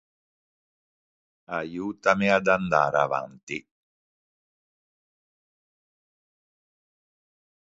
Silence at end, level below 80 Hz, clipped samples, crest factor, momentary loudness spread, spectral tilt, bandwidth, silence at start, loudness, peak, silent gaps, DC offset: 4.15 s; -64 dBFS; under 0.1%; 26 dB; 14 LU; -5.5 dB/octave; 7.8 kHz; 1.5 s; -24 LUFS; -4 dBFS; 3.43-3.47 s; under 0.1%